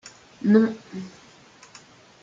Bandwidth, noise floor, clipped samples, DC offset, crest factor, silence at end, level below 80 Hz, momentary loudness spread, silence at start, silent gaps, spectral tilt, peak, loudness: 7.6 kHz; -51 dBFS; under 0.1%; under 0.1%; 20 dB; 1.15 s; -70 dBFS; 20 LU; 0.05 s; none; -7.5 dB/octave; -6 dBFS; -21 LUFS